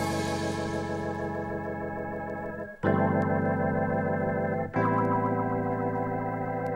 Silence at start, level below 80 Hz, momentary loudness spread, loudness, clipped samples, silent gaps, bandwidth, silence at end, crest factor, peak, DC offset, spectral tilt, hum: 0 s; -56 dBFS; 8 LU; -29 LUFS; under 0.1%; none; 16 kHz; 0 s; 16 dB; -12 dBFS; under 0.1%; -7 dB/octave; none